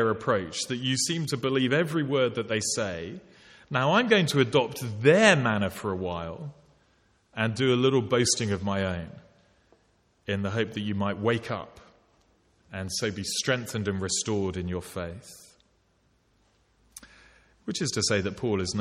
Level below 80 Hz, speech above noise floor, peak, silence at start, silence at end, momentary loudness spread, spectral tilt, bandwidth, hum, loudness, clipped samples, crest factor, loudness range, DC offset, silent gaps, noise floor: -58 dBFS; 41 dB; -4 dBFS; 0 s; 0 s; 16 LU; -4 dB/octave; 16 kHz; none; -26 LUFS; under 0.1%; 24 dB; 9 LU; under 0.1%; none; -67 dBFS